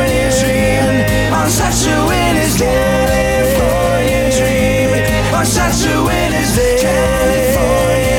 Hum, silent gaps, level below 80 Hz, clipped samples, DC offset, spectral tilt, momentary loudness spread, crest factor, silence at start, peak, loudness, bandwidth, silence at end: none; none; -22 dBFS; under 0.1%; under 0.1%; -4.5 dB/octave; 1 LU; 10 dB; 0 s; -2 dBFS; -13 LUFS; 19 kHz; 0 s